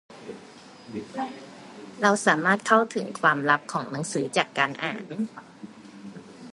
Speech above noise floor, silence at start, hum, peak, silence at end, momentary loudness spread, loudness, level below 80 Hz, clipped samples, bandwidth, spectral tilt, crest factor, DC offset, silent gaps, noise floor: 22 dB; 0.1 s; none; -2 dBFS; 0.05 s; 23 LU; -25 LUFS; -74 dBFS; under 0.1%; 11.5 kHz; -4 dB/octave; 24 dB; under 0.1%; none; -47 dBFS